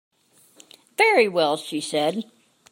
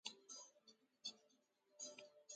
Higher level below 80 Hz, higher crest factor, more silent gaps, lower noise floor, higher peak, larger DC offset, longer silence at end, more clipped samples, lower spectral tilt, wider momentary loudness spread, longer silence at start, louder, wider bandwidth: first, -80 dBFS vs under -90 dBFS; second, 18 dB vs 28 dB; neither; second, -55 dBFS vs -80 dBFS; first, -6 dBFS vs -30 dBFS; neither; first, 0.5 s vs 0 s; neither; first, -3.5 dB/octave vs 1 dB/octave; first, 17 LU vs 7 LU; first, 1 s vs 0.05 s; first, -21 LUFS vs -56 LUFS; first, 16.5 kHz vs 9.6 kHz